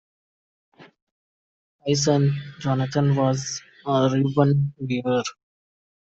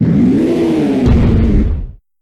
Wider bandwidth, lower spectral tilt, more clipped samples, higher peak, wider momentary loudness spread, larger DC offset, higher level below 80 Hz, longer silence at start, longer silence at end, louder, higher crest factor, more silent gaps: second, 7.8 kHz vs 11 kHz; second, -6 dB/octave vs -9 dB/octave; neither; second, -6 dBFS vs 0 dBFS; about the same, 10 LU vs 9 LU; neither; second, -60 dBFS vs -18 dBFS; first, 0.8 s vs 0 s; first, 0.7 s vs 0.3 s; second, -23 LUFS vs -12 LUFS; first, 18 dB vs 10 dB; first, 1.02-1.79 s vs none